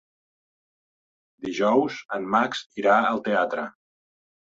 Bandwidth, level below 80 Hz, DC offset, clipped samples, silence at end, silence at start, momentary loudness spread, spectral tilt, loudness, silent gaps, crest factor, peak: 8 kHz; -70 dBFS; under 0.1%; under 0.1%; 0.8 s; 1.4 s; 12 LU; -5 dB/octave; -24 LUFS; 2.05-2.09 s, 2.66-2.70 s; 20 dB; -6 dBFS